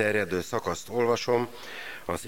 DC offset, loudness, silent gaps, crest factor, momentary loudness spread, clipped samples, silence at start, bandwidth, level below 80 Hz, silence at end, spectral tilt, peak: 0.5%; -29 LUFS; none; 18 dB; 12 LU; under 0.1%; 0 s; 17 kHz; -58 dBFS; 0 s; -4.5 dB/octave; -10 dBFS